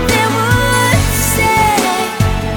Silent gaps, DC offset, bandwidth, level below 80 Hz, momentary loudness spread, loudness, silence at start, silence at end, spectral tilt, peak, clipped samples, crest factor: none; under 0.1%; 19 kHz; -24 dBFS; 4 LU; -12 LUFS; 0 s; 0 s; -4 dB/octave; 0 dBFS; under 0.1%; 12 dB